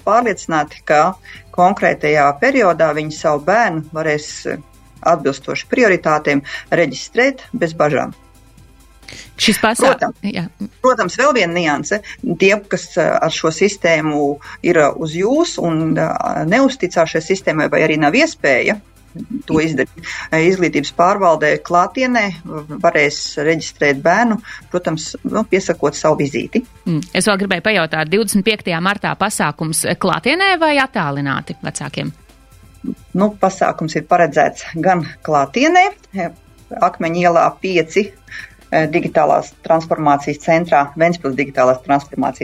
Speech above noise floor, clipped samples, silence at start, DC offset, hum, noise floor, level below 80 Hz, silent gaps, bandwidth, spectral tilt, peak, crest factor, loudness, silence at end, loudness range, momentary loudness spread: 29 dB; under 0.1%; 0.05 s; under 0.1%; none; -44 dBFS; -48 dBFS; none; 15.5 kHz; -4.5 dB/octave; 0 dBFS; 16 dB; -16 LUFS; 0 s; 3 LU; 10 LU